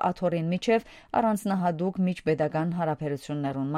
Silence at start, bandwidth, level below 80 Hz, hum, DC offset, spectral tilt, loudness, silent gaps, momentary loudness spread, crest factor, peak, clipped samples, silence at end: 0 s; 15 kHz; -60 dBFS; none; under 0.1%; -7 dB/octave; -28 LUFS; none; 5 LU; 16 dB; -12 dBFS; under 0.1%; 0 s